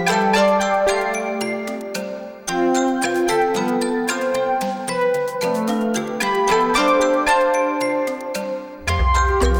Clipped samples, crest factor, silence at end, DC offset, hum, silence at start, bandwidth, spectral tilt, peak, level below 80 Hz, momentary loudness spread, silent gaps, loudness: under 0.1%; 16 dB; 0 s; under 0.1%; none; 0 s; over 20 kHz; -4.5 dB/octave; -4 dBFS; -32 dBFS; 10 LU; none; -19 LUFS